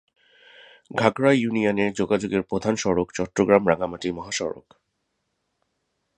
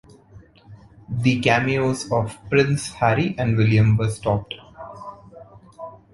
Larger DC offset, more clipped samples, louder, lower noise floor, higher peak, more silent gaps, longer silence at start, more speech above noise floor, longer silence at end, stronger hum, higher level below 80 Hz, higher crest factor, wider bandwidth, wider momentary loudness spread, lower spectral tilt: neither; neither; second, -23 LUFS vs -20 LUFS; first, -76 dBFS vs -48 dBFS; about the same, -2 dBFS vs -2 dBFS; neither; first, 0.9 s vs 0.35 s; first, 53 dB vs 28 dB; first, 1.6 s vs 0.2 s; neither; second, -54 dBFS vs -46 dBFS; about the same, 22 dB vs 20 dB; second, 10 kHz vs 11.5 kHz; second, 10 LU vs 21 LU; about the same, -5.5 dB/octave vs -6.5 dB/octave